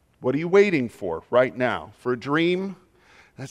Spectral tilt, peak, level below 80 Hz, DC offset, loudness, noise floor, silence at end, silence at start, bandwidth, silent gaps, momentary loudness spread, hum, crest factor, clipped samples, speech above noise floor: -6.5 dB/octave; -4 dBFS; -64 dBFS; under 0.1%; -23 LUFS; -55 dBFS; 0 s; 0.2 s; 10.5 kHz; none; 12 LU; none; 18 dB; under 0.1%; 33 dB